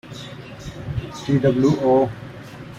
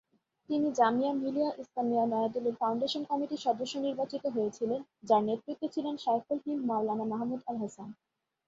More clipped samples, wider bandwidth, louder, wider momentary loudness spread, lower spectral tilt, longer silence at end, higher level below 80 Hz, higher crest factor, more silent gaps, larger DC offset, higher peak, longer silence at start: neither; first, 12 kHz vs 7.8 kHz; first, -20 LUFS vs -32 LUFS; first, 19 LU vs 8 LU; first, -7.5 dB/octave vs -5.5 dB/octave; second, 0 s vs 0.55 s; first, -46 dBFS vs -76 dBFS; about the same, 16 dB vs 18 dB; neither; neither; first, -6 dBFS vs -14 dBFS; second, 0.05 s vs 0.5 s